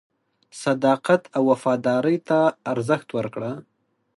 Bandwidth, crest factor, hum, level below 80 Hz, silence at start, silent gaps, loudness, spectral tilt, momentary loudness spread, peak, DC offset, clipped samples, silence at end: 11.5 kHz; 18 dB; none; -70 dBFS; 0.55 s; none; -22 LUFS; -6.5 dB/octave; 9 LU; -4 dBFS; under 0.1%; under 0.1%; 0.55 s